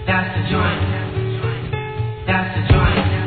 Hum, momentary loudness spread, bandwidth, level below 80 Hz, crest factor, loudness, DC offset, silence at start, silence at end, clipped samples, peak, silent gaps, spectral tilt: none; 9 LU; 4.6 kHz; -28 dBFS; 18 dB; -19 LUFS; 0.3%; 0 s; 0 s; under 0.1%; 0 dBFS; none; -10 dB/octave